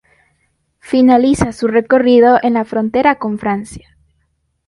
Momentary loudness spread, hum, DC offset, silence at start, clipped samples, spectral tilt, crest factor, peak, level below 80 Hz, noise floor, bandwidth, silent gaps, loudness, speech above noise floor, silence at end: 10 LU; none; under 0.1%; 0.9 s; under 0.1%; -6 dB/octave; 14 dB; 0 dBFS; -42 dBFS; -64 dBFS; 11.5 kHz; none; -13 LUFS; 52 dB; 0.9 s